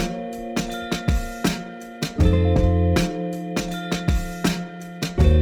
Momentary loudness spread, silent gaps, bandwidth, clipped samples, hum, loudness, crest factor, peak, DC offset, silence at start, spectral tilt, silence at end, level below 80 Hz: 11 LU; none; 18 kHz; under 0.1%; none; -23 LUFS; 16 dB; -4 dBFS; under 0.1%; 0 s; -6 dB/octave; 0 s; -28 dBFS